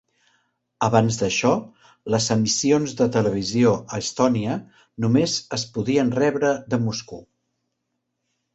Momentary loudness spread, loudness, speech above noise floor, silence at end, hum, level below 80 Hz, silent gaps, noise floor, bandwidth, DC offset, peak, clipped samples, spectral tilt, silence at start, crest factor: 8 LU; -22 LUFS; 56 dB; 1.3 s; none; -56 dBFS; none; -77 dBFS; 8.2 kHz; under 0.1%; -4 dBFS; under 0.1%; -5 dB/octave; 0.8 s; 20 dB